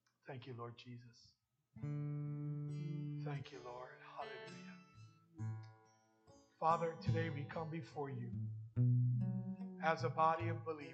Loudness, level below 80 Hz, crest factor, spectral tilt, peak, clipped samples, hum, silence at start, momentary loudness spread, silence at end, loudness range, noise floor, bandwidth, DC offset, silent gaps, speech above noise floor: -42 LUFS; -74 dBFS; 22 dB; -8 dB/octave; -20 dBFS; under 0.1%; none; 0.25 s; 18 LU; 0 s; 10 LU; -72 dBFS; 7.8 kHz; under 0.1%; none; 31 dB